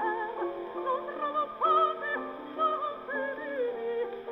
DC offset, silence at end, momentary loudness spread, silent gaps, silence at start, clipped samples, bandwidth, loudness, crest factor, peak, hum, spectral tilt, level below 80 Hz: under 0.1%; 0 s; 9 LU; none; 0 s; under 0.1%; 5.6 kHz; -31 LUFS; 16 dB; -16 dBFS; none; -6 dB/octave; -72 dBFS